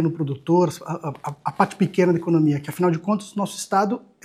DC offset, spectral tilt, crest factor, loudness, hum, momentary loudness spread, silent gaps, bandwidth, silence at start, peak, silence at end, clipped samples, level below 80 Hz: under 0.1%; -7 dB/octave; 18 dB; -22 LUFS; none; 11 LU; none; 15.5 kHz; 0 s; -2 dBFS; 0.25 s; under 0.1%; -68 dBFS